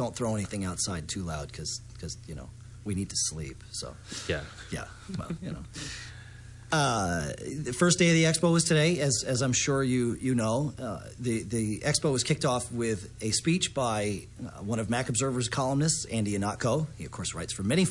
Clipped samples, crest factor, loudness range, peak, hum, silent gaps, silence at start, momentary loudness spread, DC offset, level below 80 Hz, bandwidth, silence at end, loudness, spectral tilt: under 0.1%; 18 dB; 10 LU; -10 dBFS; none; none; 0 s; 15 LU; under 0.1%; -52 dBFS; 11.5 kHz; 0 s; -29 LUFS; -4.5 dB/octave